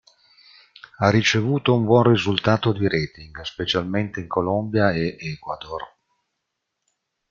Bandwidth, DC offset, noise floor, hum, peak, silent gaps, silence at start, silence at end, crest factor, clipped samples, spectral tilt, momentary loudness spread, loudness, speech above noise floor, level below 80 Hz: 7.4 kHz; under 0.1%; -79 dBFS; none; -2 dBFS; none; 1 s; 1.45 s; 20 dB; under 0.1%; -6 dB/octave; 15 LU; -21 LUFS; 58 dB; -54 dBFS